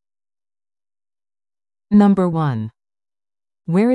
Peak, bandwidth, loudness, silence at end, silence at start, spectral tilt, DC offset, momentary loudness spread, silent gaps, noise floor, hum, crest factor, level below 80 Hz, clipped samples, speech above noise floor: -4 dBFS; 7.8 kHz; -17 LUFS; 0 s; 1.9 s; -9.5 dB/octave; under 0.1%; 18 LU; none; under -90 dBFS; none; 18 dB; -56 dBFS; under 0.1%; over 75 dB